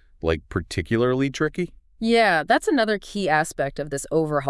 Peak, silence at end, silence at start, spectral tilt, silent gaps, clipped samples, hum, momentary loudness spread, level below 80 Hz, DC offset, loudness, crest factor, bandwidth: -6 dBFS; 0 s; 0.25 s; -5 dB/octave; none; under 0.1%; none; 10 LU; -46 dBFS; under 0.1%; -23 LUFS; 16 dB; 12 kHz